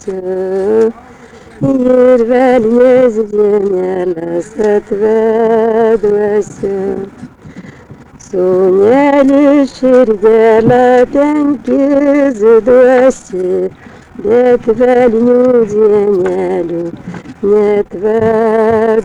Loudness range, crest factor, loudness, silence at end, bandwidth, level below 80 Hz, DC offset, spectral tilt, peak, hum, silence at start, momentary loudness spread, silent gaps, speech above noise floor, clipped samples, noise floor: 4 LU; 10 dB; -10 LUFS; 0 s; 10 kHz; -42 dBFS; under 0.1%; -7 dB/octave; 0 dBFS; none; 0.05 s; 10 LU; none; 26 dB; under 0.1%; -35 dBFS